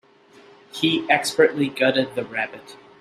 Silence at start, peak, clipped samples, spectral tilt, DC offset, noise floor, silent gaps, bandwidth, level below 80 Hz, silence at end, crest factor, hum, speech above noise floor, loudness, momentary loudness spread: 0.75 s; -2 dBFS; under 0.1%; -4 dB/octave; under 0.1%; -51 dBFS; none; 15 kHz; -68 dBFS; 0.25 s; 20 dB; none; 30 dB; -21 LUFS; 11 LU